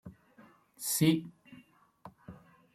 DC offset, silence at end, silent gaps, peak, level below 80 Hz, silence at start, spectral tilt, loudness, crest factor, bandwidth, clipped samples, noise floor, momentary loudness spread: under 0.1%; 0.4 s; none; -14 dBFS; -70 dBFS; 0.05 s; -4.5 dB/octave; -30 LUFS; 22 dB; 16.5 kHz; under 0.1%; -61 dBFS; 26 LU